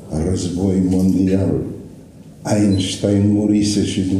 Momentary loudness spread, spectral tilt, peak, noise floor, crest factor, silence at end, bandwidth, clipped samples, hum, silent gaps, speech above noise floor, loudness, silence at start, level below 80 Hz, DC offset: 7 LU; -6.5 dB/octave; -4 dBFS; -39 dBFS; 12 dB; 0 s; 12.5 kHz; under 0.1%; none; none; 23 dB; -17 LUFS; 0 s; -42 dBFS; under 0.1%